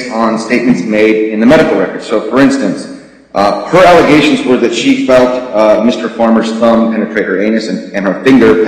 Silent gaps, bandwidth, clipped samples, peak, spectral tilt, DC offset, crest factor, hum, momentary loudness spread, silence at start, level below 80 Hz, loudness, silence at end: none; 12 kHz; 0.2%; 0 dBFS; -5.5 dB/octave; 0.2%; 8 dB; none; 9 LU; 0 s; -42 dBFS; -9 LUFS; 0 s